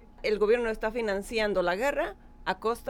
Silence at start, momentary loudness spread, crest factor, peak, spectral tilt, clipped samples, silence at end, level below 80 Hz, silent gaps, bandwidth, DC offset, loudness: 0 s; 8 LU; 16 dB; -14 dBFS; -4.5 dB/octave; under 0.1%; 0 s; -48 dBFS; none; 16.5 kHz; under 0.1%; -29 LUFS